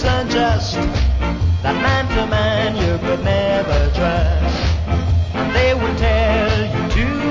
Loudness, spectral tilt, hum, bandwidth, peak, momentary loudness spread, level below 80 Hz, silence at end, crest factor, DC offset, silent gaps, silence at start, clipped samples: -17 LUFS; -6.5 dB/octave; none; 7.6 kHz; -4 dBFS; 3 LU; -20 dBFS; 0 s; 12 dB; under 0.1%; none; 0 s; under 0.1%